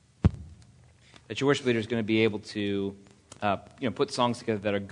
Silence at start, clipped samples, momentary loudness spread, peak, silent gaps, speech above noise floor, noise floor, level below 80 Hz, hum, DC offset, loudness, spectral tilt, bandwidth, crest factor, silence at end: 0.25 s; under 0.1%; 8 LU; -8 dBFS; none; 29 dB; -57 dBFS; -46 dBFS; none; under 0.1%; -29 LUFS; -6 dB/octave; 10.5 kHz; 20 dB; 0 s